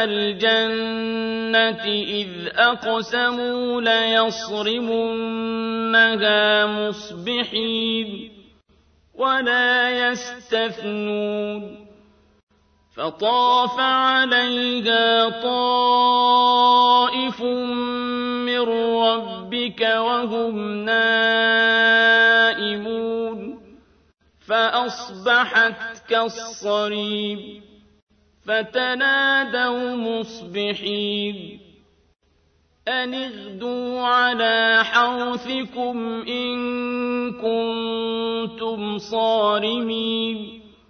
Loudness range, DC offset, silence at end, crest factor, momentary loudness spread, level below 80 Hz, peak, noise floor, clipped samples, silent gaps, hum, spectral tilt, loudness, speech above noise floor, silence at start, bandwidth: 8 LU; under 0.1%; 0.2 s; 18 dB; 12 LU; -62 dBFS; -4 dBFS; -62 dBFS; under 0.1%; 12.43-12.47 s, 28.02-28.07 s; none; -3.5 dB/octave; -20 LUFS; 41 dB; 0 s; 6.6 kHz